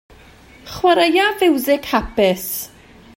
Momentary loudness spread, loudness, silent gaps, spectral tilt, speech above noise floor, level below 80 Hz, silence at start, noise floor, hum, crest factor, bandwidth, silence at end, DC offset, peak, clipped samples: 13 LU; -17 LUFS; none; -4 dB/octave; 28 dB; -42 dBFS; 0.65 s; -44 dBFS; none; 16 dB; 16.5 kHz; 0.5 s; under 0.1%; -2 dBFS; under 0.1%